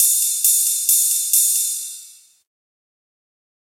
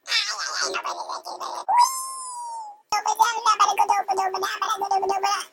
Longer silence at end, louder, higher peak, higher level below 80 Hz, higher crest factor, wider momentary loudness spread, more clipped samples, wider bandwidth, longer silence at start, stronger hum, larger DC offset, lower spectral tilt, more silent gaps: first, 1.55 s vs 0.05 s; first, -15 LUFS vs -23 LUFS; first, 0 dBFS vs -6 dBFS; second, under -90 dBFS vs -74 dBFS; about the same, 20 dB vs 18 dB; about the same, 12 LU vs 13 LU; neither; about the same, 16 kHz vs 17 kHz; about the same, 0 s vs 0.05 s; neither; neither; second, 9.5 dB/octave vs 1 dB/octave; neither